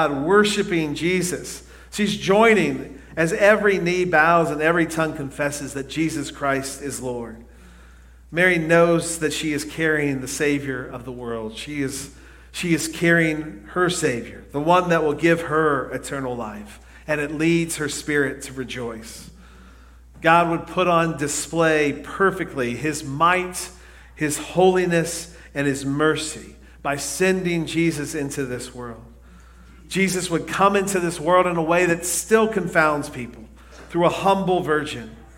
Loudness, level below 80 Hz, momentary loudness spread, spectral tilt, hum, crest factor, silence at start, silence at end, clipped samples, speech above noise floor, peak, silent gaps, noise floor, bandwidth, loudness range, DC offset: -21 LUFS; -48 dBFS; 14 LU; -4.5 dB/octave; none; 20 dB; 0 s; 0.1 s; under 0.1%; 25 dB; 0 dBFS; none; -46 dBFS; 16.5 kHz; 6 LU; under 0.1%